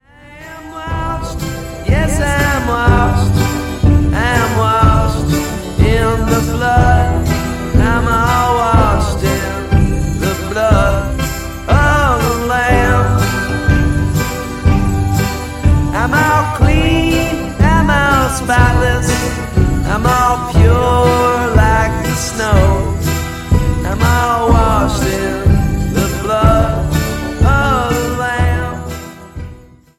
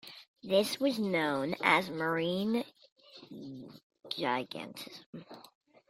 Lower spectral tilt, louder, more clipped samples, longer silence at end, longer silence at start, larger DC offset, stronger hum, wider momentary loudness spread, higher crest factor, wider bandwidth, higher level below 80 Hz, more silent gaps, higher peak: first, -6 dB/octave vs -4.5 dB/octave; first, -13 LUFS vs -32 LUFS; neither; about the same, 0.4 s vs 0.5 s; first, 0.3 s vs 0.05 s; neither; neither; second, 8 LU vs 22 LU; second, 12 dB vs 24 dB; about the same, 15.5 kHz vs 16 kHz; first, -20 dBFS vs -76 dBFS; second, none vs 0.28-0.34 s, 2.92-2.96 s, 3.83-3.90 s, 5.06-5.13 s; first, 0 dBFS vs -10 dBFS